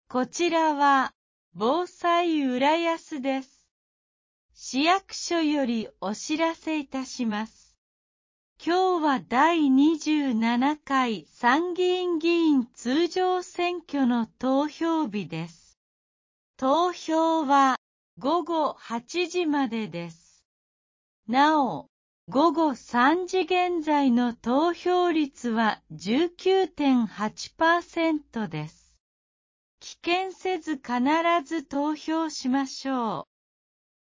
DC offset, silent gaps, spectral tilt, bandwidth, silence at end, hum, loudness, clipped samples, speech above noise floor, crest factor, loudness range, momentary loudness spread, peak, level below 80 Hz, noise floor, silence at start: under 0.1%; 1.15-1.52 s, 3.71-4.49 s, 7.78-8.56 s, 15.77-16.54 s, 17.78-18.17 s, 20.45-21.23 s, 21.89-22.27 s, 29.00-29.78 s; -4.5 dB/octave; 7.6 kHz; 0.8 s; none; -25 LUFS; under 0.1%; over 65 dB; 16 dB; 5 LU; 11 LU; -10 dBFS; -68 dBFS; under -90 dBFS; 0.1 s